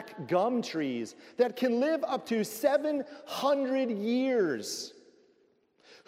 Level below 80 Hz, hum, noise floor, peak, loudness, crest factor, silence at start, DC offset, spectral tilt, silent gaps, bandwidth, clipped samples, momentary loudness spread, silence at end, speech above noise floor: -86 dBFS; none; -68 dBFS; -12 dBFS; -30 LUFS; 18 dB; 0 s; under 0.1%; -4.5 dB/octave; none; 16 kHz; under 0.1%; 10 LU; 1.15 s; 39 dB